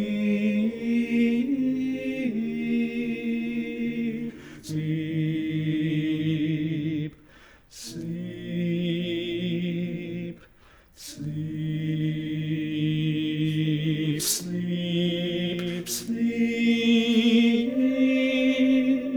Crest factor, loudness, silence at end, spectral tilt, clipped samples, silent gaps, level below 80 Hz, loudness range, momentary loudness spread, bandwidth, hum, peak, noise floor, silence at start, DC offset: 16 dB; -26 LUFS; 0 s; -5.5 dB/octave; under 0.1%; none; -60 dBFS; 8 LU; 12 LU; over 20 kHz; none; -10 dBFS; -55 dBFS; 0 s; under 0.1%